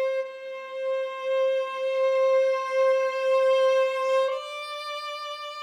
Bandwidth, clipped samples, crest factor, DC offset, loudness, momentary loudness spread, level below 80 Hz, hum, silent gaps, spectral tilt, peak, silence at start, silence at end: 10 kHz; under 0.1%; 12 dB; under 0.1%; -25 LUFS; 12 LU; -84 dBFS; none; none; 1.5 dB/octave; -14 dBFS; 0 s; 0 s